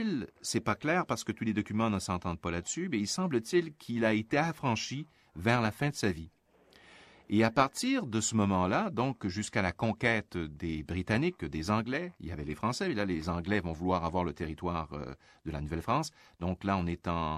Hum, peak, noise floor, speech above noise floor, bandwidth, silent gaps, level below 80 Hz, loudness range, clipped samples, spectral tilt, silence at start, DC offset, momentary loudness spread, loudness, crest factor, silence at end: none; -10 dBFS; -62 dBFS; 30 dB; 15 kHz; none; -54 dBFS; 4 LU; under 0.1%; -5 dB/octave; 0 s; under 0.1%; 9 LU; -32 LUFS; 22 dB; 0 s